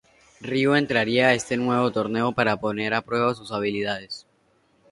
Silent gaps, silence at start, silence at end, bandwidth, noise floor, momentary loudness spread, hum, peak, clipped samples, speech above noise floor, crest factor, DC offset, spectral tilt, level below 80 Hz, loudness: none; 0.4 s; 0.7 s; 11.5 kHz; -64 dBFS; 9 LU; none; -4 dBFS; under 0.1%; 41 dB; 20 dB; under 0.1%; -5 dB/octave; -60 dBFS; -23 LUFS